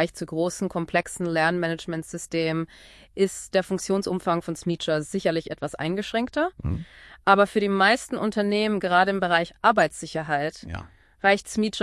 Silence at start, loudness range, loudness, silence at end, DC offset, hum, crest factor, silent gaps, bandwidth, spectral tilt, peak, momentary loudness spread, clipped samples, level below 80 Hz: 0 s; 5 LU; -24 LUFS; 0 s; under 0.1%; none; 20 dB; none; 12 kHz; -5 dB/octave; -4 dBFS; 11 LU; under 0.1%; -52 dBFS